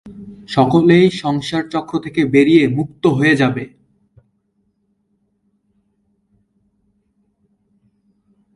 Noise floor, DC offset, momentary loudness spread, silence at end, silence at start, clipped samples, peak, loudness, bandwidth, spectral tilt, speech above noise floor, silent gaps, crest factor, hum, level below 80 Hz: -65 dBFS; under 0.1%; 13 LU; 4.9 s; 0.05 s; under 0.1%; 0 dBFS; -15 LUFS; 11.5 kHz; -7 dB/octave; 51 dB; none; 18 dB; none; -54 dBFS